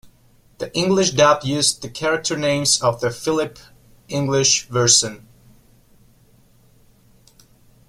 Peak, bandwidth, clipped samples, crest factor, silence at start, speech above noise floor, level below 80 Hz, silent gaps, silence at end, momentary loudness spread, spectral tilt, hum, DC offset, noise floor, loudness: 0 dBFS; 16 kHz; under 0.1%; 22 dB; 0.05 s; 35 dB; -54 dBFS; none; 2.7 s; 12 LU; -3 dB/octave; none; under 0.1%; -54 dBFS; -18 LUFS